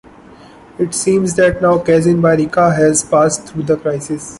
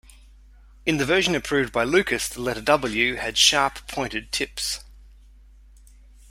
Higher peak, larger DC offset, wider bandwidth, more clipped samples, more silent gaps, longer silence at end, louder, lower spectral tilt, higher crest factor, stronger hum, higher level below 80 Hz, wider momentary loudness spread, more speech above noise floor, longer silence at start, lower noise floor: about the same, -2 dBFS vs -2 dBFS; neither; second, 11.5 kHz vs 16 kHz; neither; neither; second, 0 s vs 1.25 s; first, -14 LUFS vs -22 LUFS; first, -5.5 dB/octave vs -2.5 dB/octave; second, 12 dB vs 22 dB; neither; about the same, -42 dBFS vs -46 dBFS; second, 8 LU vs 11 LU; about the same, 26 dB vs 26 dB; about the same, 0.8 s vs 0.85 s; second, -40 dBFS vs -49 dBFS